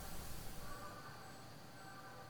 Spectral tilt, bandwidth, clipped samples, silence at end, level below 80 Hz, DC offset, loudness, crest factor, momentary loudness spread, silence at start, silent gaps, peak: -3.5 dB/octave; over 20 kHz; under 0.1%; 0 s; -58 dBFS; 0.1%; -53 LUFS; 16 dB; 5 LU; 0 s; none; -34 dBFS